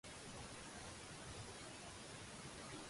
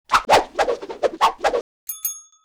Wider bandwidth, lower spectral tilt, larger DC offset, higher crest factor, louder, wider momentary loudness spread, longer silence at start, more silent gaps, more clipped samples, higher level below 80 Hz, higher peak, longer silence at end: second, 11.5 kHz vs over 20 kHz; first, -3 dB/octave vs -1.5 dB/octave; neither; about the same, 14 dB vs 14 dB; second, -53 LUFS vs -21 LUFS; second, 1 LU vs 11 LU; about the same, 0.05 s vs 0.1 s; second, none vs 1.61-1.87 s; neither; second, -66 dBFS vs -48 dBFS; second, -40 dBFS vs -8 dBFS; second, 0 s vs 0.25 s